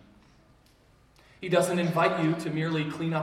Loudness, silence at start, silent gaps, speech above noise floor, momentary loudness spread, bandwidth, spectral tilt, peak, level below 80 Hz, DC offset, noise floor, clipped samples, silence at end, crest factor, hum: -27 LUFS; 1.4 s; none; 34 dB; 5 LU; 15.5 kHz; -6 dB/octave; -10 dBFS; -64 dBFS; under 0.1%; -60 dBFS; under 0.1%; 0 s; 18 dB; none